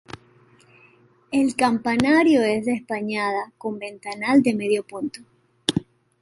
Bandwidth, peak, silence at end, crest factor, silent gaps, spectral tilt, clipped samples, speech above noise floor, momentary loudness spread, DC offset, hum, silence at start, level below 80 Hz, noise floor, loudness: 11.5 kHz; 0 dBFS; 0.4 s; 22 dB; none; -5 dB/octave; under 0.1%; 35 dB; 15 LU; under 0.1%; none; 1.3 s; -58 dBFS; -56 dBFS; -22 LUFS